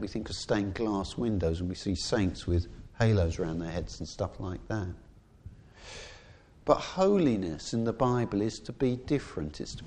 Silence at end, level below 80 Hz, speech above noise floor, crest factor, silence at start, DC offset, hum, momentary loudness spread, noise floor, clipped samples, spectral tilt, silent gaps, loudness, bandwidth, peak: 0 s; -46 dBFS; 24 dB; 22 dB; 0 s; under 0.1%; none; 14 LU; -54 dBFS; under 0.1%; -6.5 dB/octave; none; -31 LUFS; 10 kHz; -8 dBFS